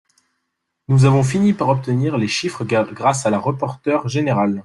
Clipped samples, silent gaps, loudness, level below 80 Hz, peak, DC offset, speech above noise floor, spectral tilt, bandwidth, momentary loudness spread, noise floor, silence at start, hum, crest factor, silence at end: under 0.1%; none; -18 LUFS; -54 dBFS; -2 dBFS; under 0.1%; 58 dB; -6.5 dB/octave; 11.5 kHz; 6 LU; -75 dBFS; 0.9 s; none; 16 dB; 0.05 s